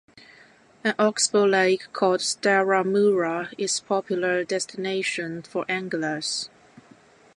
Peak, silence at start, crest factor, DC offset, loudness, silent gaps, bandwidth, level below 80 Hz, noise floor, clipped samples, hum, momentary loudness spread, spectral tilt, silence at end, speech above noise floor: -8 dBFS; 0.85 s; 18 dB; under 0.1%; -24 LUFS; none; 11.5 kHz; -74 dBFS; -54 dBFS; under 0.1%; none; 8 LU; -3 dB/octave; 0.9 s; 30 dB